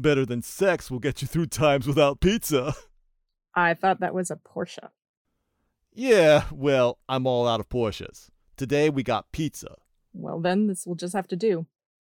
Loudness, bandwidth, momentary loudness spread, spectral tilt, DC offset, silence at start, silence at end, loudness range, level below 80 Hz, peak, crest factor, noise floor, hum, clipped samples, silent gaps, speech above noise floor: -24 LUFS; 19 kHz; 14 LU; -5.5 dB/octave; under 0.1%; 0 s; 0.45 s; 5 LU; -48 dBFS; -8 dBFS; 18 dB; -75 dBFS; none; under 0.1%; 5.09-5.25 s; 51 dB